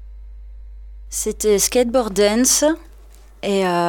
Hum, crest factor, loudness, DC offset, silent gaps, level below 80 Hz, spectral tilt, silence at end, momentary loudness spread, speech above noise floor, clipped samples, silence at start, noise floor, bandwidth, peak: none; 18 dB; -18 LUFS; under 0.1%; none; -38 dBFS; -3 dB/octave; 0 s; 13 LU; 26 dB; under 0.1%; 0 s; -43 dBFS; 19 kHz; -2 dBFS